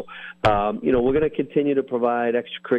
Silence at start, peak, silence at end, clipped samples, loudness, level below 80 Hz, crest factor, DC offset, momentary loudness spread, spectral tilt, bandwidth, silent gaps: 0 s; -8 dBFS; 0 s; under 0.1%; -22 LUFS; -44 dBFS; 14 dB; under 0.1%; 4 LU; -7.5 dB/octave; 8.4 kHz; none